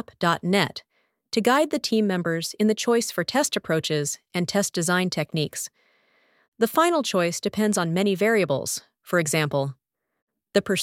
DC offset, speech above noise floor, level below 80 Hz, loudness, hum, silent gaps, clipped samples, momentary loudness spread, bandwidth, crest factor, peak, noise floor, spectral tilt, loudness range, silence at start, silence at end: under 0.1%; 40 dB; -66 dBFS; -24 LUFS; none; 6.48-6.52 s, 10.22-10.27 s; under 0.1%; 7 LU; 17 kHz; 20 dB; -4 dBFS; -64 dBFS; -4 dB/octave; 2 LU; 0.2 s; 0 s